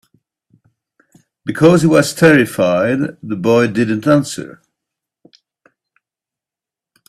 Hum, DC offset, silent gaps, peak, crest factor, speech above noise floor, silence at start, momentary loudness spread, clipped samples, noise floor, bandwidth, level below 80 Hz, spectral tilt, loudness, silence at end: none; under 0.1%; none; 0 dBFS; 16 dB; 75 dB; 1.45 s; 15 LU; under 0.1%; -88 dBFS; 14.5 kHz; -54 dBFS; -6 dB/octave; -13 LUFS; 2.6 s